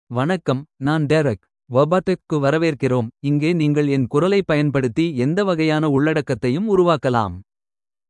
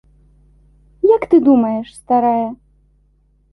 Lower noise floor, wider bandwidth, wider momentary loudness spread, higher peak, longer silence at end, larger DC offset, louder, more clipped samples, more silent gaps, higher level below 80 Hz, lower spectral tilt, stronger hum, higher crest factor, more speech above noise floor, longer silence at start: first, under -90 dBFS vs -56 dBFS; about the same, 11 kHz vs 11.5 kHz; second, 5 LU vs 10 LU; about the same, -2 dBFS vs -2 dBFS; second, 0.7 s vs 1 s; neither; second, -19 LUFS vs -15 LUFS; neither; neither; about the same, -54 dBFS vs -52 dBFS; about the same, -7.5 dB/octave vs -7.5 dB/octave; second, none vs 50 Hz at -50 dBFS; about the same, 16 dB vs 16 dB; first, over 72 dB vs 42 dB; second, 0.1 s vs 1.05 s